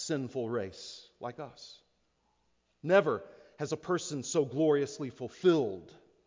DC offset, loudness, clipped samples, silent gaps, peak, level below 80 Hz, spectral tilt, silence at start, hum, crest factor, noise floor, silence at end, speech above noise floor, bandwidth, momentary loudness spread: under 0.1%; -32 LUFS; under 0.1%; none; -12 dBFS; -70 dBFS; -5 dB/octave; 0 s; none; 20 dB; -75 dBFS; 0.35 s; 43 dB; 7.6 kHz; 18 LU